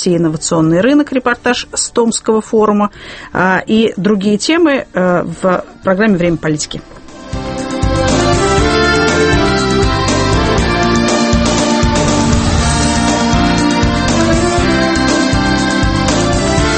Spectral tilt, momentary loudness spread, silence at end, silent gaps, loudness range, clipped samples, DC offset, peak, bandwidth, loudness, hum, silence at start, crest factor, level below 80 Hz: -4.5 dB/octave; 5 LU; 0 s; none; 3 LU; under 0.1%; under 0.1%; 0 dBFS; 8.8 kHz; -12 LUFS; none; 0 s; 12 dB; -24 dBFS